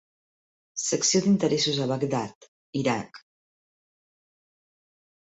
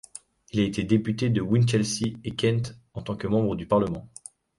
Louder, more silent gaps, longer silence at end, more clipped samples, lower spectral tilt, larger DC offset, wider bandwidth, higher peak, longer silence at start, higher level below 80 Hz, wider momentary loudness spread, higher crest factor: about the same, -25 LUFS vs -26 LUFS; first, 2.35-2.41 s, 2.48-2.73 s vs none; first, 2.05 s vs 0.5 s; neither; second, -4 dB/octave vs -6 dB/octave; neither; second, 8.2 kHz vs 11.5 kHz; about the same, -10 dBFS vs -8 dBFS; first, 0.75 s vs 0.55 s; second, -68 dBFS vs -52 dBFS; about the same, 14 LU vs 15 LU; about the same, 20 dB vs 18 dB